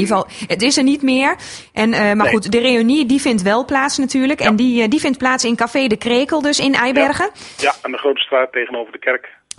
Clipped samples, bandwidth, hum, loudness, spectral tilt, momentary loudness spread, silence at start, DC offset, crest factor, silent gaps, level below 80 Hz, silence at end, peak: under 0.1%; 11.5 kHz; none; -15 LUFS; -3.5 dB/octave; 7 LU; 0 s; under 0.1%; 16 dB; none; -50 dBFS; 0.3 s; 0 dBFS